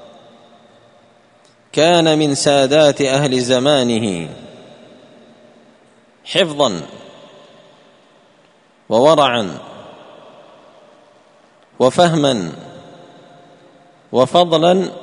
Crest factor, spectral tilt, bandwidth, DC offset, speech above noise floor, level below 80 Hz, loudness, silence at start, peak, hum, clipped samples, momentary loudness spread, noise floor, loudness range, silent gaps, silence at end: 18 dB; -4.5 dB/octave; 11 kHz; under 0.1%; 38 dB; -58 dBFS; -14 LUFS; 1.75 s; 0 dBFS; none; under 0.1%; 19 LU; -52 dBFS; 9 LU; none; 0 s